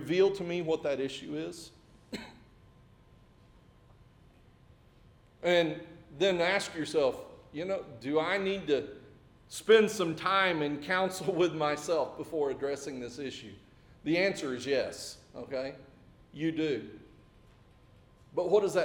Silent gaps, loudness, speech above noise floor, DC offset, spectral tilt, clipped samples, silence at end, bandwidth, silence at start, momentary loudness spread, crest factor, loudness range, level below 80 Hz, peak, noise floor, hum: none; -31 LUFS; 29 dB; under 0.1%; -4.5 dB/octave; under 0.1%; 0 s; 18 kHz; 0 s; 18 LU; 22 dB; 10 LU; -64 dBFS; -12 dBFS; -60 dBFS; none